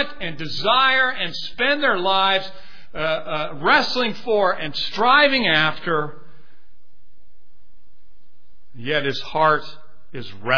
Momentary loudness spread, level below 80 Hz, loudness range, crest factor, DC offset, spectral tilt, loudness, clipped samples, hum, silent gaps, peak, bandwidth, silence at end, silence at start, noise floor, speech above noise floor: 17 LU; -52 dBFS; 11 LU; 18 dB; 4%; -4.5 dB/octave; -19 LUFS; under 0.1%; none; none; -2 dBFS; 5.4 kHz; 0 s; 0 s; -60 dBFS; 40 dB